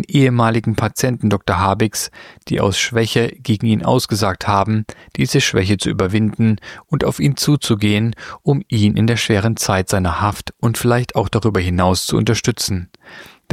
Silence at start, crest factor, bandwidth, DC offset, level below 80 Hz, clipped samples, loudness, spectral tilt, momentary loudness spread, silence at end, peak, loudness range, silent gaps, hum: 0 s; 16 dB; 16 kHz; under 0.1%; -40 dBFS; under 0.1%; -17 LUFS; -5 dB/octave; 6 LU; 0.3 s; -2 dBFS; 1 LU; none; none